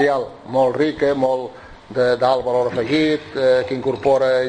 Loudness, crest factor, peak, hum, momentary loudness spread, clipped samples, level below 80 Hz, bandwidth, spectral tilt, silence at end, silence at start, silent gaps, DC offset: -19 LUFS; 14 dB; -4 dBFS; none; 6 LU; under 0.1%; -50 dBFS; 9.2 kHz; -6 dB/octave; 0 s; 0 s; none; under 0.1%